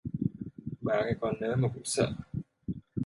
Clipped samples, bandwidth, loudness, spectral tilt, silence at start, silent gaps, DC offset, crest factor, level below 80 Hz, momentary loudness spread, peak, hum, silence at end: under 0.1%; 11.5 kHz; -33 LUFS; -5.5 dB/octave; 0.05 s; none; under 0.1%; 20 dB; -54 dBFS; 11 LU; -12 dBFS; none; 0 s